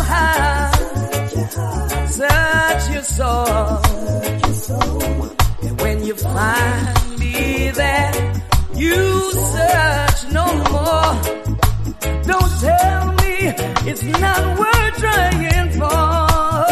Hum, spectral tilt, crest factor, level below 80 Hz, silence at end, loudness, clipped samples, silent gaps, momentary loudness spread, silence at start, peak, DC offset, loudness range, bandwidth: none; -4.5 dB/octave; 14 dB; -22 dBFS; 0 s; -17 LUFS; under 0.1%; none; 6 LU; 0 s; -2 dBFS; under 0.1%; 3 LU; 13.5 kHz